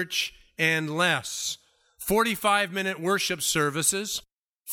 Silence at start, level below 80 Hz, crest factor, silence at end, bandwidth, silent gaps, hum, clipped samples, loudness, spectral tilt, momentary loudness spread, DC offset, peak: 0 s; -58 dBFS; 20 dB; 0 s; 18 kHz; 4.32-4.59 s; none; under 0.1%; -25 LUFS; -2.5 dB/octave; 9 LU; under 0.1%; -8 dBFS